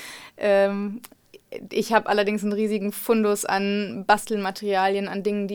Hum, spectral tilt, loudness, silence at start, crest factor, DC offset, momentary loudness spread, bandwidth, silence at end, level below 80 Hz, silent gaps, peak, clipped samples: none; -4.5 dB/octave; -23 LUFS; 0 s; 20 dB; under 0.1%; 10 LU; 19.5 kHz; 0 s; -62 dBFS; none; -4 dBFS; under 0.1%